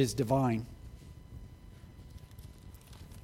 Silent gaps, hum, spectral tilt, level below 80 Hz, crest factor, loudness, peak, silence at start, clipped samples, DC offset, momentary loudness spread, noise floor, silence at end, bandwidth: none; none; -6.5 dB/octave; -52 dBFS; 22 dB; -31 LUFS; -14 dBFS; 0 s; under 0.1%; under 0.1%; 24 LU; -52 dBFS; 0 s; 16.5 kHz